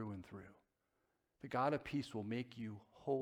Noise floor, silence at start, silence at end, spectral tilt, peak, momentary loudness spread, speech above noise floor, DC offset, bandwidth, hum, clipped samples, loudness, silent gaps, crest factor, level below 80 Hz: -84 dBFS; 0 s; 0 s; -7 dB/octave; -24 dBFS; 18 LU; 42 dB; under 0.1%; 14 kHz; none; under 0.1%; -43 LUFS; none; 20 dB; -74 dBFS